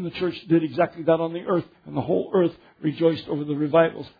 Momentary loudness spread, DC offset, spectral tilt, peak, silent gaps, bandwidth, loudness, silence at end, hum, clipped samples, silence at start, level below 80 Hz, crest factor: 8 LU; under 0.1%; -9.5 dB/octave; -6 dBFS; none; 5 kHz; -24 LUFS; 0.1 s; none; under 0.1%; 0 s; -62 dBFS; 18 dB